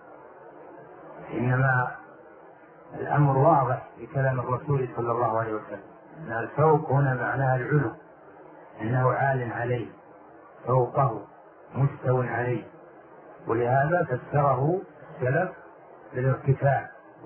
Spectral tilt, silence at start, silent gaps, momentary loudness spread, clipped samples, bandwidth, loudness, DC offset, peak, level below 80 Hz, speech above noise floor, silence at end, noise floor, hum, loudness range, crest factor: -12.5 dB/octave; 0.05 s; none; 20 LU; under 0.1%; 3.2 kHz; -26 LUFS; under 0.1%; -8 dBFS; -60 dBFS; 25 dB; 0 s; -50 dBFS; none; 3 LU; 18 dB